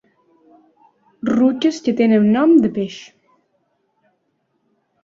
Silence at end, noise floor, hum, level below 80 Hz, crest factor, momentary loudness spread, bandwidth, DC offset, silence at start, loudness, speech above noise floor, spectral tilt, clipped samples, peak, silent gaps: 2 s; -68 dBFS; none; -62 dBFS; 16 dB; 14 LU; 7.6 kHz; under 0.1%; 1.25 s; -16 LUFS; 53 dB; -6.5 dB/octave; under 0.1%; -4 dBFS; none